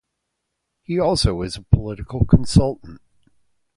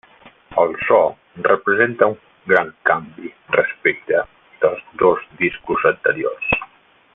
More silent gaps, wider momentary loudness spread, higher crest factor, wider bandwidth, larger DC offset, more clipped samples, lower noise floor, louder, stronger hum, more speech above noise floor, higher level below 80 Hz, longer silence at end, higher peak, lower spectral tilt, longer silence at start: neither; first, 12 LU vs 7 LU; about the same, 20 dB vs 18 dB; first, 11.5 kHz vs 3.9 kHz; neither; neither; first, -77 dBFS vs -50 dBFS; about the same, -20 LUFS vs -18 LUFS; neither; first, 59 dB vs 32 dB; first, -30 dBFS vs -52 dBFS; first, 0.8 s vs 0.5 s; about the same, 0 dBFS vs 0 dBFS; second, -6.5 dB/octave vs -8 dB/octave; first, 0.9 s vs 0.25 s